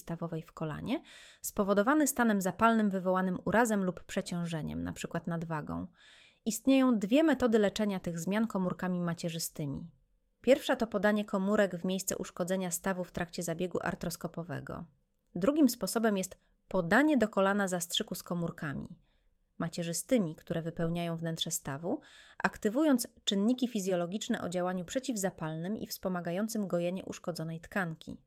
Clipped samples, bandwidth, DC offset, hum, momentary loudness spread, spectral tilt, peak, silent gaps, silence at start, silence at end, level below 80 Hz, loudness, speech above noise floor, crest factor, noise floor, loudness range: under 0.1%; 16.5 kHz; under 0.1%; none; 12 LU; -5 dB/octave; -12 dBFS; none; 0.05 s; 0.1 s; -60 dBFS; -32 LUFS; 39 dB; 20 dB; -71 dBFS; 6 LU